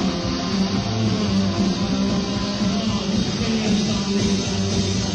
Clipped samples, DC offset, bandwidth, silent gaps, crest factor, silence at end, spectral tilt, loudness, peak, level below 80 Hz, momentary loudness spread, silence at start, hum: under 0.1%; under 0.1%; 10 kHz; none; 14 dB; 0 s; -5 dB/octave; -21 LUFS; -8 dBFS; -38 dBFS; 2 LU; 0 s; none